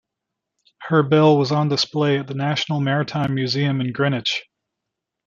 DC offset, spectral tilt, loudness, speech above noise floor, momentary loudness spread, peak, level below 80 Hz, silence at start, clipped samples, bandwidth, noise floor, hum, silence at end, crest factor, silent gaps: under 0.1%; -6 dB/octave; -20 LUFS; 63 dB; 8 LU; -2 dBFS; -62 dBFS; 0.8 s; under 0.1%; 7.6 kHz; -82 dBFS; none; 0.85 s; 18 dB; none